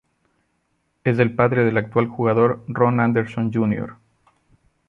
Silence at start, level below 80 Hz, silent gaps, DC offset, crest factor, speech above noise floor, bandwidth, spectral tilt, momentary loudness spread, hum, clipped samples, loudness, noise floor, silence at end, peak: 1.05 s; -56 dBFS; none; under 0.1%; 18 dB; 50 dB; 5.2 kHz; -10 dB/octave; 6 LU; none; under 0.1%; -20 LUFS; -69 dBFS; 0.95 s; -2 dBFS